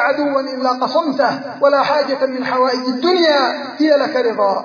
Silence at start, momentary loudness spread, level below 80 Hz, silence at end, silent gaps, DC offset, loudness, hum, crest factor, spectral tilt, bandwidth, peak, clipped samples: 0 s; 5 LU; -70 dBFS; 0 s; none; under 0.1%; -16 LUFS; none; 14 dB; -4.5 dB/octave; 5.4 kHz; 0 dBFS; under 0.1%